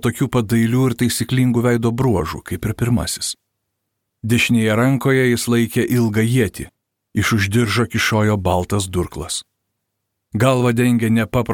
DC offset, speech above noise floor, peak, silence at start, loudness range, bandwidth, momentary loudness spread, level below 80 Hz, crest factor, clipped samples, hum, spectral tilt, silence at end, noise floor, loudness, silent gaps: under 0.1%; 59 dB; -2 dBFS; 0.05 s; 2 LU; 18 kHz; 10 LU; -42 dBFS; 16 dB; under 0.1%; none; -5.5 dB/octave; 0 s; -76 dBFS; -18 LUFS; none